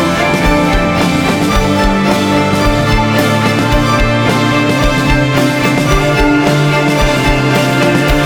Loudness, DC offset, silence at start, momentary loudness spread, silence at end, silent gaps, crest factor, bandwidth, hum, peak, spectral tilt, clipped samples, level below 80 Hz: -11 LUFS; under 0.1%; 0 s; 1 LU; 0 s; none; 10 dB; over 20 kHz; none; 0 dBFS; -5.5 dB/octave; under 0.1%; -20 dBFS